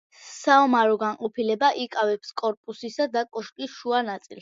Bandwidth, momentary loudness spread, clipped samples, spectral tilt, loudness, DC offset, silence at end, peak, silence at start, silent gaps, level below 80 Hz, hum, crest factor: 7.8 kHz; 15 LU; under 0.1%; -3.5 dB/octave; -24 LUFS; under 0.1%; 0 s; -6 dBFS; 0.2 s; 2.57-2.64 s; -78 dBFS; none; 18 dB